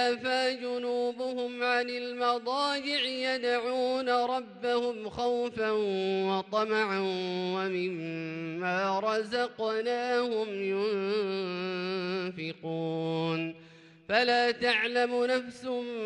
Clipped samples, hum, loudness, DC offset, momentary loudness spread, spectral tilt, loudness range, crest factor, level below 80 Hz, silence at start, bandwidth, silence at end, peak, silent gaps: under 0.1%; none; -30 LUFS; under 0.1%; 7 LU; -5 dB/octave; 3 LU; 18 dB; -72 dBFS; 0 s; 10.5 kHz; 0 s; -12 dBFS; none